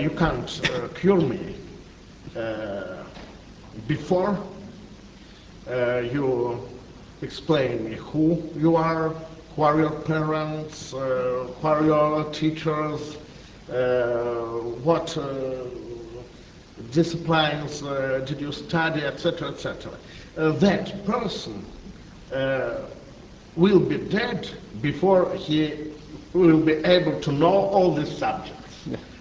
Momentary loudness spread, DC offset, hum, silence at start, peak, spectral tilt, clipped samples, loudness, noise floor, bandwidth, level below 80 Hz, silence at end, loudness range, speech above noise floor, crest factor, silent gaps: 20 LU; under 0.1%; none; 0 s; -4 dBFS; -6.5 dB/octave; under 0.1%; -24 LUFS; -46 dBFS; 8 kHz; -48 dBFS; 0 s; 7 LU; 23 dB; 20 dB; none